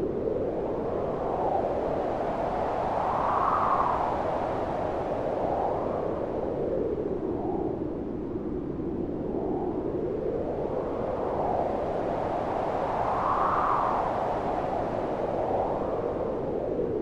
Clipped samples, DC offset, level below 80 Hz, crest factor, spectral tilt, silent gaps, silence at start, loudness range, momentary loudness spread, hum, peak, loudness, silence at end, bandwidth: under 0.1%; under 0.1%; -46 dBFS; 16 dB; -8.5 dB/octave; none; 0 s; 4 LU; 6 LU; none; -12 dBFS; -29 LUFS; 0 s; 10.5 kHz